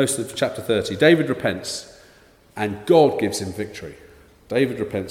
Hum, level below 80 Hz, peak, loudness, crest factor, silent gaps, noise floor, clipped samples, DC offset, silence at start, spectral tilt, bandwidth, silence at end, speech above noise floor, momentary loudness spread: none; -56 dBFS; 0 dBFS; -21 LUFS; 20 dB; none; -52 dBFS; under 0.1%; under 0.1%; 0 s; -4.5 dB/octave; 16.5 kHz; 0 s; 32 dB; 16 LU